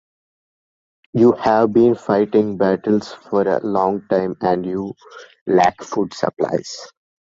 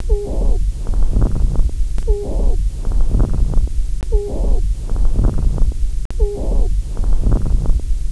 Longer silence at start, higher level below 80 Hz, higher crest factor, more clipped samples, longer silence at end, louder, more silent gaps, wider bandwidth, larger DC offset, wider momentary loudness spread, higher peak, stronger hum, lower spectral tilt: first, 1.15 s vs 0 s; second, -56 dBFS vs -14 dBFS; about the same, 16 dB vs 12 dB; neither; first, 0.35 s vs 0 s; first, -18 LUFS vs -21 LUFS; about the same, 5.41-5.46 s vs 6.05-6.10 s; second, 7.8 kHz vs 11 kHz; neither; first, 12 LU vs 4 LU; about the same, -2 dBFS vs -2 dBFS; neither; second, -6.5 dB/octave vs -8 dB/octave